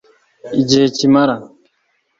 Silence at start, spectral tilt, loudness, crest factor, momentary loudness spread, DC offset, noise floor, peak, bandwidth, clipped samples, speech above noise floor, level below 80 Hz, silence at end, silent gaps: 0.45 s; -5 dB/octave; -14 LUFS; 16 dB; 9 LU; under 0.1%; -64 dBFS; 0 dBFS; 7.8 kHz; under 0.1%; 51 dB; -54 dBFS; 0.75 s; none